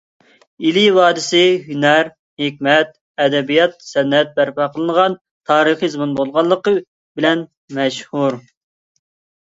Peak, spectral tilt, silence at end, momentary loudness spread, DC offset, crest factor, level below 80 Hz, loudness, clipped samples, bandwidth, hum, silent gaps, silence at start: 0 dBFS; -4.5 dB/octave; 1.05 s; 8 LU; under 0.1%; 16 dB; -64 dBFS; -16 LUFS; under 0.1%; 8 kHz; none; 2.19-2.37 s, 3.01-3.14 s, 5.21-5.25 s, 5.31-5.41 s, 6.87-7.15 s, 7.57-7.68 s; 0.6 s